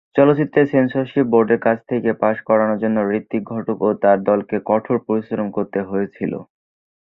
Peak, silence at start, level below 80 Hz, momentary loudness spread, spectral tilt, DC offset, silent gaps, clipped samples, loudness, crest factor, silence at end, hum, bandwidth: -2 dBFS; 0.15 s; -60 dBFS; 9 LU; -10.5 dB/octave; under 0.1%; none; under 0.1%; -18 LUFS; 16 dB; 0.75 s; none; 4.1 kHz